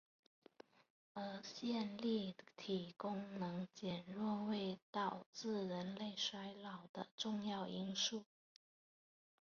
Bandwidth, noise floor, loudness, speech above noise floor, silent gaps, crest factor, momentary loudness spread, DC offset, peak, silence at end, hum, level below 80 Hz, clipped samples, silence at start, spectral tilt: 7 kHz; under -90 dBFS; -45 LUFS; over 45 dB; 4.82-4.93 s, 5.26-5.33 s, 6.89-6.94 s, 7.11-7.18 s; 18 dB; 9 LU; under 0.1%; -28 dBFS; 1.3 s; none; -84 dBFS; under 0.1%; 1.15 s; -4 dB/octave